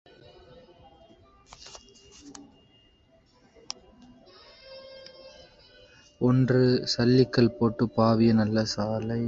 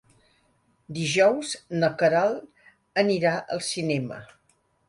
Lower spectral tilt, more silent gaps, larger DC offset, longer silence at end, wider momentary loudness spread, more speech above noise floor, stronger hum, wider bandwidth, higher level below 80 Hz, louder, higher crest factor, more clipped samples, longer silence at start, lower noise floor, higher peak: first, -6.5 dB/octave vs -4.5 dB/octave; neither; neither; second, 0 s vs 0.65 s; first, 25 LU vs 13 LU; second, 39 dB vs 43 dB; neither; second, 7.8 kHz vs 11.5 kHz; first, -56 dBFS vs -66 dBFS; about the same, -24 LUFS vs -25 LUFS; about the same, 20 dB vs 20 dB; neither; first, 1.65 s vs 0.9 s; second, -62 dBFS vs -67 dBFS; about the same, -6 dBFS vs -6 dBFS